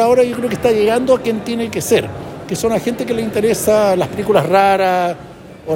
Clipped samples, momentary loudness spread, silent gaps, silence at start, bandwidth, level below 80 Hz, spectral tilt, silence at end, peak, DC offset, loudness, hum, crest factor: under 0.1%; 9 LU; none; 0 s; 17 kHz; -46 dBFS; -5 dB/octave; 0 s; -2 dBFS; under 0.1%; -15 LUFS; none; 14 dB